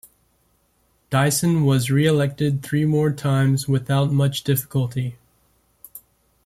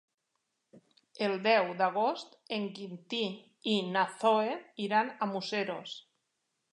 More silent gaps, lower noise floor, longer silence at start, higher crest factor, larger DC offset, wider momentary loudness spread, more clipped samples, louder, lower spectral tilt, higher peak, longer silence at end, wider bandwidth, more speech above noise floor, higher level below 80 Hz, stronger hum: neither; second, -64 dBFS vs -83 dBFS; first, 1.1 s vs 0.75 s; about the same, 16 dB vs 20 dB; neither; second, 9 LU vs 12 LU; neither; first, -20 LUFS vs -32 LUFS; about the same, -6 dB/octave vs -5 dB/octave; first, -6 dBFS vs -14 dBFS; second, 0.45 s vs 0.7 s; first, 15 kHz vs 11 kHz; second, 45 dB vs 51 dB; first, -54 dBFS vs -88 dBFS; neither